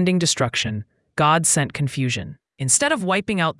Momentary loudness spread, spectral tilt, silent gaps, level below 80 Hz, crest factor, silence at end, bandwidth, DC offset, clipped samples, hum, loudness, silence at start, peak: 12 LU; -3.5 dB/octave; none; -56 dBFS; 18 dB; 0.05 s; 12 kHz; under 0.1%; under 0.1%; none; -20 LUFS; 0 s; -2 dBFS